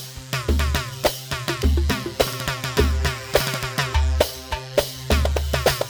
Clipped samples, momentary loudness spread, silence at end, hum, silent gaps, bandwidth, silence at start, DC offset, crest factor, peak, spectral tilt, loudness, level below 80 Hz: under 0.1%; 4 LU; 0 s; none; none; over 20 kHz; 0 s; under 0.1%; 20 dB; -2 dBFS; -4.5 dB/octave; -23 LUFS; -26 dBFS